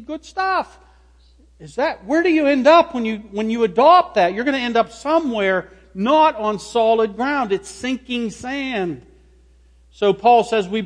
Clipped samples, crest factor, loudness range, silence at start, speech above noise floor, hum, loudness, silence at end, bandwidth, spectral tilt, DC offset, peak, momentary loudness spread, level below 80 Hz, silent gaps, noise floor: under 0.1%; 16 dB; 6 LU; 0 s; 33 dB; 60 Hz at -50 dBFS; -18 LUFS; 0 s; 10.5 kHz; -5 dB/octave; under 0.1%; -2 dBFS; 13 LU; -52 dBFS; none; -51 dBFS